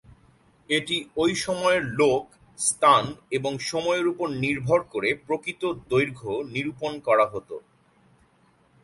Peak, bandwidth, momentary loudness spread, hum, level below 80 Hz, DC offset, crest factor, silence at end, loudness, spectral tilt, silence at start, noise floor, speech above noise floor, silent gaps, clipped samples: -4 dBFS; 11.5 kHz; 9 LU; none; -58 dBFS; under 0.1%; 20 dB; 1.25 s; -24 LUFS; -4 dB/octave; 0.1 s; -62 dBFS; 37 dB; none; under 0.1%